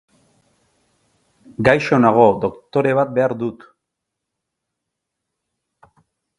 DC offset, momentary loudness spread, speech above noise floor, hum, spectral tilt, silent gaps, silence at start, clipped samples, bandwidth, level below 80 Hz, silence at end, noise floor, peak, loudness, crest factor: under 0.1%; 13 LU; 64 dB; none; -7.5 dB/octave; none; 1.6 s; under 0.1%; 11 kHz; -54 dBFS; 2.85 s; -80 dBFS; 0 dBFS; -17 LUFS; 20 dB